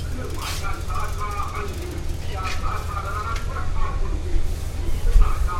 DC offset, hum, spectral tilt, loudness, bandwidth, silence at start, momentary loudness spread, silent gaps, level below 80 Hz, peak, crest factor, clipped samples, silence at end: under 0.1%; none; -5 dB/octave; -28 LUFS; 15 kHz; 0 s; 7 LU; none; -24 dBFS; -2 dBFS; 20 dB; under 0.1%; 0 s